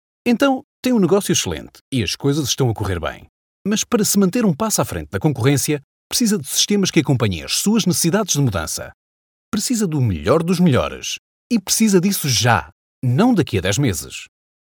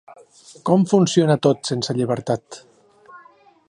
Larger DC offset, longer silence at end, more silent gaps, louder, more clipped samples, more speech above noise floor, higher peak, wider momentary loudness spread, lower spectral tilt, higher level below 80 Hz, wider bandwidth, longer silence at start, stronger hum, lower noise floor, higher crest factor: neither; about the same, 0.5 s vs 0.5 s; first, 0.64-0.83 s, 1.81-1.92 s, 3.29-3.65 s, 5.84-6.10 s, 8.94-9.52 s, 11.19-11.50 s, 12.72-13.02 s vs none; about the same, -18 LUFS vs -19 LUFS; neither; first, over 72 dB vs 32 dB; about the same, 0 dBFS vs -2 dBFS; second, 10 LU vs 13 LU; second, -4.5 dB/octave vs -6 dB/octave; first, -44 dBFS vs -62 dBFS; first, 19 kHz vs 11 kHz; first, 0.25 s vs 0.1 s; neither; first, under -90 dBFS vs -51 dBFS; about the same, 18 dB vs 18 dB